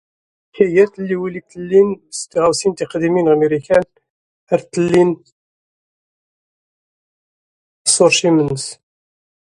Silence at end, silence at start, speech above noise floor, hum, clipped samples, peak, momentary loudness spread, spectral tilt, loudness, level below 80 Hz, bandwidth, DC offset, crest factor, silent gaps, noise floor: 0.8 s; 0.55 s; over 75 dB; none; under 0.1%; 0 dBFS; 13 LU; -4 dB/octave; -16 LUFS; -54 dBFS; 11.5 kHz; under 0.1%; 18 dB; 4.10-4.47 s, 5.32-7.85 s; under -90 dBFS